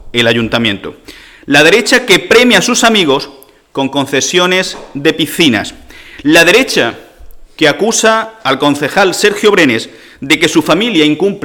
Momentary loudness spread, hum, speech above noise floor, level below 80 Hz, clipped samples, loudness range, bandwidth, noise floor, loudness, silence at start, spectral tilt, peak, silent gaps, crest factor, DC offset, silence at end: 11 LU; none; 22 dB; -42 dBFS; under 0.1%; 2 LU; 19.5 kHz; -32 dBFS; -9 LUFS; 0.05 s; -3 dB/octave; 0 dBFS; none; 10 dB; under 0.1%; 0.05 s